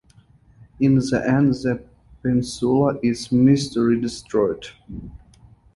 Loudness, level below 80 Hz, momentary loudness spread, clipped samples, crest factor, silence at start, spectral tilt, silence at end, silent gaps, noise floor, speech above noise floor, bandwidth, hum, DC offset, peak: -20 LUFS; -48 dBFS; 15 LU; under 0.1%; 16 dB; 0.8 s; -7 dB/octave; 0.6 s; none; -53 dBFS; 33 dB; 11.5 kHz; none; under 0.1%; -6 dBFS